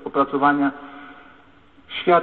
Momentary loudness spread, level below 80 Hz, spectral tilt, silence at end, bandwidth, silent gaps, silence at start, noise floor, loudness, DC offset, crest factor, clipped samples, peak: 22 LU; -60 dBFS; -9 dB/octave; 0 s; 4.4 kHz; none; 0.05 s; -52 dBFS; -21 LUFS; 0.2%; 20 dB; under 0.1%; -2 dBFS